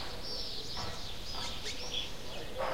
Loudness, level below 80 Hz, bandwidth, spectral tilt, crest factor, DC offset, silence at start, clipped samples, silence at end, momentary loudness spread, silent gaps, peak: -39 LUFS; -50 dBFS; 16 kHz; -2.5 dB/octave; 16 dB; 1%; 0 s; under 0.1%; 0 s; 5 LU; none; -22 dBFS